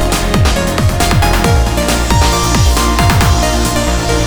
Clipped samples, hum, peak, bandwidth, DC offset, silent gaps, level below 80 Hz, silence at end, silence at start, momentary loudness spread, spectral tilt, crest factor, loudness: under 0.1%; none; 0 dBFS; over 20 kHz; under 0.1%; none; -16 dBFS; 0 s; 0 s; 3 LU; -4.5 dB/octave; 10 dB; -12 LUFS